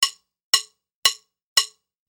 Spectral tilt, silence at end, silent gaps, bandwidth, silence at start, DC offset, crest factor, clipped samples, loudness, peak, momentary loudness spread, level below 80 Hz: 3.5 dB/octave; 0.45 s; 0.43-0.53 s, 0.94-1.02 s, 1.43-1.56 s; over 20 kHz; 0 s; under 0.1%; 22 dB; under 0.1%; -21 LUFS; -2 dBFS; 7 LU; -72 dBFS